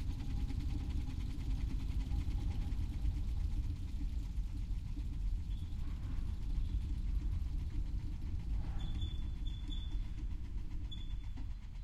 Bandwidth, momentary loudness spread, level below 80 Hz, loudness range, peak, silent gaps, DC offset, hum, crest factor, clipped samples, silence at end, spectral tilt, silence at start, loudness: 9.6 kHz; 5 LU; -38 dBFS; 3 LU; -24 dBFS; none; under 0.1%; none; 14 dB; under 0.1%; 0 s; -7 dB/octave; 0 s; -42 LUFS